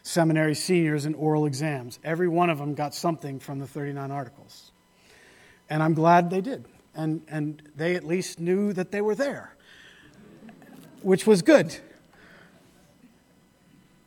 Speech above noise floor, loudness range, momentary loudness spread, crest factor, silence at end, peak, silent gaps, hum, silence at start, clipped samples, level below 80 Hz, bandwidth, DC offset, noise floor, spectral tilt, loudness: 36 dB; 5 LU; 15 LU; 22 dB; 2.2 s; -4 dBFS; none; none; 0.05 s; under 0.1%; -70 dBFS; 18 kHz; under 0.1%; -60 dBFS; -6 dB/octave; -25 LUFS